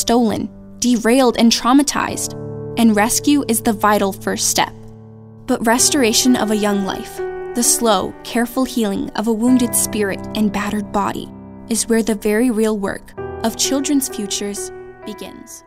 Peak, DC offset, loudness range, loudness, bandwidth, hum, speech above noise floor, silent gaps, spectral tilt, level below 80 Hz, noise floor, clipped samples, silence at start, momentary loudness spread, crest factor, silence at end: 0 dBFS; under 0.1%; 4 LU; -17 LUFS; 16 kHz; none; 22 dB; none; -3 dB/octave; -42 dBFS; -38 dBFS; under 0.1%; 0 s; 14 LU; 16 dB; 0.1 s